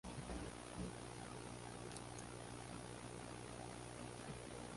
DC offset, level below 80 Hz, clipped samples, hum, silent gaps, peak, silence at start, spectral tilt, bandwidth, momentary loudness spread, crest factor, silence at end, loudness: under 0.1%; -62 dBFS; under 0.1%; 60 Hz at -60 dBFS; none; -32 dBFS; 0.05 s; -4.5 dB/octave; 11.5 kHz; 2 LU; 20 dB; 0 s; -52 LUFS